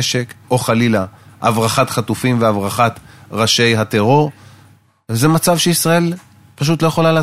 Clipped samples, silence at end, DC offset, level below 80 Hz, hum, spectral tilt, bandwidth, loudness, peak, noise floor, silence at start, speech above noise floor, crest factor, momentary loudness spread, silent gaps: under 0.1%; 0 s; under 0.1%; -50 dBFS; none; -4.5 dB/octave; 16 kHz; -15 LUFS; 0 dBFS; -48 dBFS; 0 s; 34 dB; 16 dB; 9 LU; none